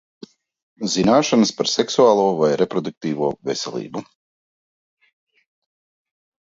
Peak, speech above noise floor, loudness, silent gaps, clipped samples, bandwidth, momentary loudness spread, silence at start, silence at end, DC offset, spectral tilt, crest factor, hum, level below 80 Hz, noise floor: -2 dBFS; over 71 dB; -19 LUFS; 2.97-3.01 s; under 0.1%; 8 kHz; 13 LU; 0.8 s; 2.45 s; under 0.1%; -4.5 dB/octave; 20 dB; none; -60 dBFS; under -90 dBFS